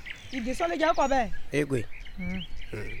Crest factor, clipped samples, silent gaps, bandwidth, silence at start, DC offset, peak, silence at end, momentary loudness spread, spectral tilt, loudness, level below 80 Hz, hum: 16 dB; under 0.1%; none; 13 kHz; 0 s; under 0.1%; -12 dBFS; 0 s; 14 LU; -5.5 dB/octave; -30 LUFS; -40 dBFS; none